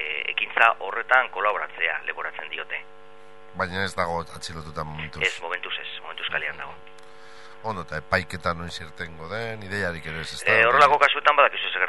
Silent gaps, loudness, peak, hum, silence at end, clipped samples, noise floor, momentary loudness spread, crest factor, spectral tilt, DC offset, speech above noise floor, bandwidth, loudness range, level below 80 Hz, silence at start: none; -23 LUFS; 0 dBFS; none; 0 s; under 0.1%; -49 dBFS; 17 LU; 26 dB; -3.5 dB/octave; 0.8%; 25 dB; 11.5 kHz; 9 LU; -54 dBFS; 0 s